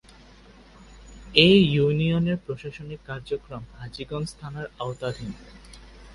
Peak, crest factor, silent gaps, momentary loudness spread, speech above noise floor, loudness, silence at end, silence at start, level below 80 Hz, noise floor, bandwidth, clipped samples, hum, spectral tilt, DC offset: 0 dBFS; 24 dB; none; 22 LU; 26 dB; -23 LUFS; 0 s; 0.8 s; -48 dBFS; -50 dBFS; 11.5 kHz; under 0.1%; none; -6.5 dB/octave; under 0.1%